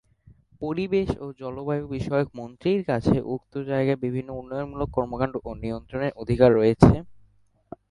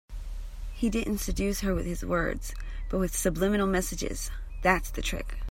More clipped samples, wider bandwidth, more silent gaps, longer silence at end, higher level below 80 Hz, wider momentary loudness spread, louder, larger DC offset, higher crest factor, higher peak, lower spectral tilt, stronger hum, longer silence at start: neither; second, 11 kHz vs 16.5 kHz; neither; first, 0.7 s vs 0 s; second, -42 dBFS vs -36 dBFS; about the same, 14 LU vs 14 LU; first, -25 LUFS vs -30 LUFS; neither; about the same, 24 dB vs 22 dB; first, 0 dBFS vs -6 dBFS; first, -8.5 dB/octave vs -4.5 dB/octave; neither; first, 0.6 s vs 0.1 s